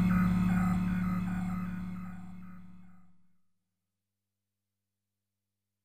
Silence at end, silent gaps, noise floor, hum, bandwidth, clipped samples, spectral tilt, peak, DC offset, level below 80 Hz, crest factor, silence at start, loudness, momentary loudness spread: 0 s; none; -89 dBFS; 50 Hz at -75 dBFS; 15 kHz; under 0.1%; -8.5 dB/octave; -18 dBFS; under 0.1%; -48 dBFS; 18 dB; 0 s; -32 LUFS; 21 LU